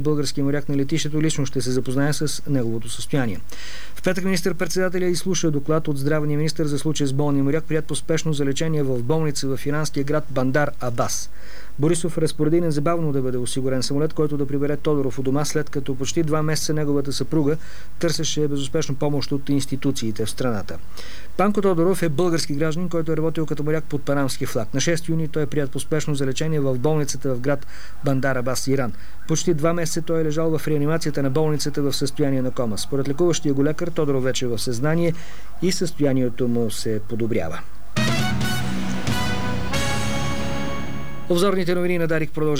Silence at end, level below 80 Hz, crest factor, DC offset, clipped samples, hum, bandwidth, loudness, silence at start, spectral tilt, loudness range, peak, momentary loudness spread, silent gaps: 0 s; -44 dBFS; 16 dB; 7%; under 0.1%; none; 19.5 kHz; -23 LUFS; 0 s; -5.5 dB/octave; 2 LU; -6 dBFS; 5 LU; none